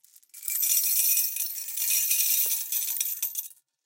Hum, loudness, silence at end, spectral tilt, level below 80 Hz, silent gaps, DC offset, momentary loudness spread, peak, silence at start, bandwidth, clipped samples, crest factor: none; -24 LUFS; 0.35 s; 6 dB/octave; under -90 dBFS; none; under 0.1%; 10 LU; -8 dBFS; 0.35 s; 17 kHz; under 0.1%; 20 dB